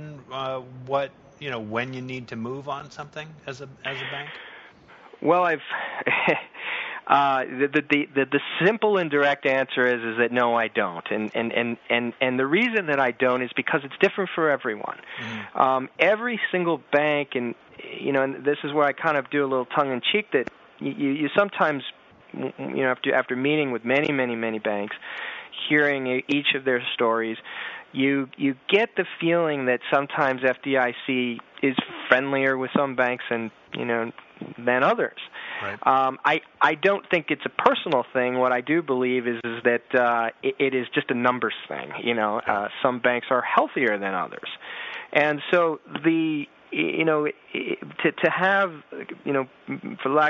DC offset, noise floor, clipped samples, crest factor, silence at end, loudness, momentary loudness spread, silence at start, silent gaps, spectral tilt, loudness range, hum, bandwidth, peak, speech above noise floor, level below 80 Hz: under 0.1%; -49 dBFS; under 0.1%; 22 dB; 0 s; -24 LUFS; 12 LU; 0 s; none; -2.5 dB/octave; 3 LU; none; 7.4 kHz; -2 dBFS; 25 dB; -72 dBFS